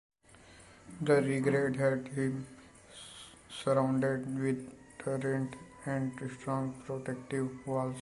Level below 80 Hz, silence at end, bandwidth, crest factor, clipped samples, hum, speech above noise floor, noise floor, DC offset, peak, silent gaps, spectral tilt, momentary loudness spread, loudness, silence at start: -66 dBFS; 0 s; 11.5 kHz; 20 dB; under 0.1%; none; 25 dB; -58 dBFS; under 0.1%; -14 dBFS; none; -6.5 dB/octave; 19 LU; -34 LUFS; 0.45 s